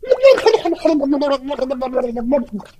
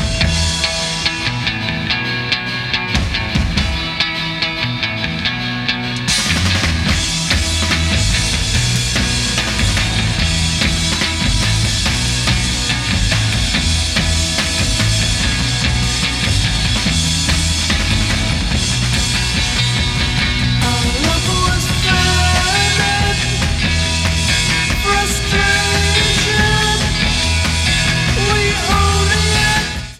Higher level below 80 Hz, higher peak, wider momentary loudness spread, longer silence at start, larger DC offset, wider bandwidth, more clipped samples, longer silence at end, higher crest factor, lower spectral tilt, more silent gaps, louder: second, -44 dBFS vs -22 dBFS; about the same, 0 dBFS vs 0 dBFS; first, 10 LU vs 5 LU; about the same, 0.05 s vs 0 s; neither; second, 12 kHz vs 15.5 kHz; neither; first, 0.2 s vs 0 s; about the same, 16 dB vs 14 dB; first, -5 dB/octave vs -3 dB/octave; neither; about the same, -16 LUFS vs -15 LUFS